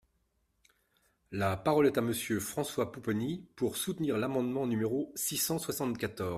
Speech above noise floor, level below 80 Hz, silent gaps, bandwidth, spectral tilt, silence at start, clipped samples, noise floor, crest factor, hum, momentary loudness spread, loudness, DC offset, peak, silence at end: 44 dB; -66 dBFS; none; 15.5 kHz; -4.5 dB/octave; 1.3 s; under 0.1%; -76 dBFS; 18 dB; none; 7 LU; -32 LUFS; under 0.1%; -14 dBFS; 0 s